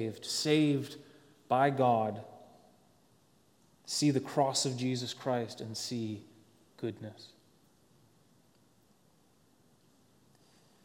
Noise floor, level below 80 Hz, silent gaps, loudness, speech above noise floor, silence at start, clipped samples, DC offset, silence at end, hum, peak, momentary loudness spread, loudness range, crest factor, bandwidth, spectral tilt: -68 dBFS; -80 dBFS; none; -32 LUFS; 36 dB; 0 s; under 0.1%; under 0.1%; 3.6 s; none; -14 dBFS; 20 LU; 17 LU; 22 dB; 17 kHz; -4.5 dB/octave